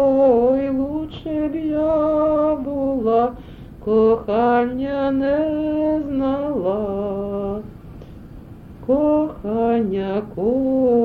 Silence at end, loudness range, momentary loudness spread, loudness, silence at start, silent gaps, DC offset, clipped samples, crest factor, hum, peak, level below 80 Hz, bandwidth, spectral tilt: 0 s; 4 LU; 15 LU; -20 LUFS; 0 s; none; under 0.1%; under 0.1%; 14 dB; none; -4 dBFS; -42 dBFS; 4.9 kHz; -9.5 dB/octave